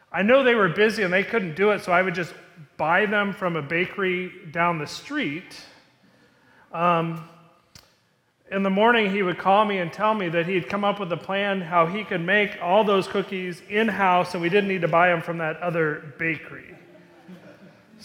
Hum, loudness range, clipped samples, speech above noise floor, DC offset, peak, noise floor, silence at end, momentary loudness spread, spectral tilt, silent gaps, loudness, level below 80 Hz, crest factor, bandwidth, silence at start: none; 6 LU; under 0.1%; 43 dB; under 0.1%; -4 dBFS; -65 dBFS; 0 s; 11 LU; -6 dB/octave; none; -22 LUFS; -66 dBFS; 18 dB; 16 kHz; 0.1 s